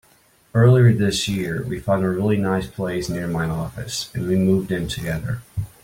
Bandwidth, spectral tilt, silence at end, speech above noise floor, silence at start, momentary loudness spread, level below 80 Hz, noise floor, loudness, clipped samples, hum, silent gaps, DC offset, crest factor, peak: 16.5 kHz; -6.5 dB/octave; 0.15 s; 36 dB; 0.55 s; 12 LU; -44 dBFS; -56 dBFS; -21 LUFS; under 0.1%; none; none; under 0.1%; 16 dB; -4 dBFS